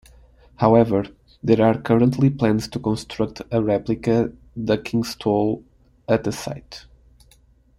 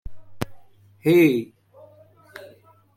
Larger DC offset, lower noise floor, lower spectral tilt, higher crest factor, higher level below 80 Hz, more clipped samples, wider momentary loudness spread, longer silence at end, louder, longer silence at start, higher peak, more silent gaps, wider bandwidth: neither; about the same, -55 dBFS vs -52 dBFS; about the same, -7 dB/octave vs -7 dB/octave; about the same, 20 dB vs 18 dB; about the same, -48 dBFS vs -52 dBFS; neither; second, 14 LU vs 26 LU; first, 1 s vs 0.5 s; about the same, -21 LUFS vs -21 LUFS; first, 0.6 s vs 0.05 s; first, -2 dBFS vs -6 dBFS; neither; second, 14 kHz vs 16 kHz